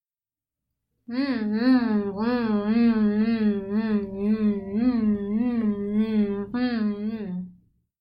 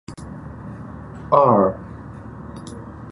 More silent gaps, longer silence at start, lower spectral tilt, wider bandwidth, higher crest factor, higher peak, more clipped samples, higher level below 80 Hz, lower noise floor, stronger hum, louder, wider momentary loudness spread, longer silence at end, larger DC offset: neither; first, 1.1 s vs 0.1 s; first, -10 dB/octave vs -8.5 dB/octave; second, 5.4 kHz vs 11.5 kHz; second, 14 dB vs 22 dB; second, -12 dBFS vs 0 dBFS; neither; second, -54 dBFS vs -44 dBFS; first, under -90 dBFS vs -36 dBFS; neither; second, -24 LUFS vs -17 LUFS; second, 9 LU vs 21 LU; first, 0.5 s vs 0 s; neither